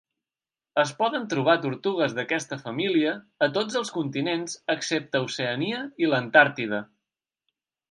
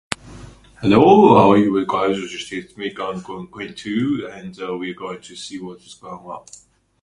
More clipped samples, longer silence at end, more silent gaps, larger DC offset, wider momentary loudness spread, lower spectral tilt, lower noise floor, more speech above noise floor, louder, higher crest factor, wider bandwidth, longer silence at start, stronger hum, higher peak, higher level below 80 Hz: neither; first, 1.05 s vs 0.65 s; neither; neither; second, 9 LU vs 23 LU; second, -4.5 dB/octave vs -6.5 dB/octave; first, under -90 dBFS vs -41 dBFS; first, over 65 dB vs 23 dB; second, -25 LUFS vs -17 LUFS; about the same, 24 dB vs 20 dB; about the same, 11.5 kHz vs 11.5 kHz; first, 0.75 s vs 0.25 s; neither; about the same, -2 dBFS vs 0 dBFS; second, -76 dBFS vs -50 dBFS